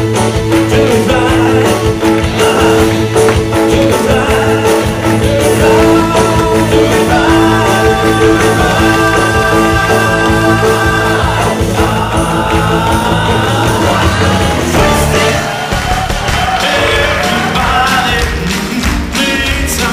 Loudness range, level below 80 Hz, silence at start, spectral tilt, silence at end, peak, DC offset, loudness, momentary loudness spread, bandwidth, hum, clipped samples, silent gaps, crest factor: 2 LU; -22 dBFS; 0 s; -5 dB/octave; 0 s; 0 dBFS; under 0.1%; -10 LUFS; 4 LU; 15.5 kHz; none; under 0.1%; none; 10 dB